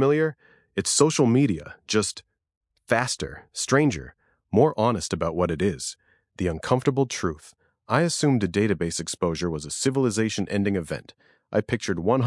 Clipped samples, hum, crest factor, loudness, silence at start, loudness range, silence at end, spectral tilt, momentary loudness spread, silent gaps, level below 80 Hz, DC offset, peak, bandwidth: under 0.1%; none; 20 dB; -24 LUFS; 0 s; 2 LU; 0 s; -5 dB/octave; 11 LU; 2.57-2.61 s; -54 dBFS; under 0.1%; -4 dBFS; 12 kHz